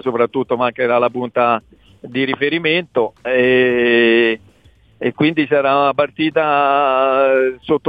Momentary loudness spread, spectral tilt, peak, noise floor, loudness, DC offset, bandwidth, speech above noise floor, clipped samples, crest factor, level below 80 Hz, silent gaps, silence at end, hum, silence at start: 7 LU; -7.5 dB/octave; -2 dBFS; -50 dBFS; -15 LUFS; under 0.1%; 4.9 kHz; 35 dB; under 0.1%; 14 dB; -56 dBFS; none; 0 s; none; 0.05 s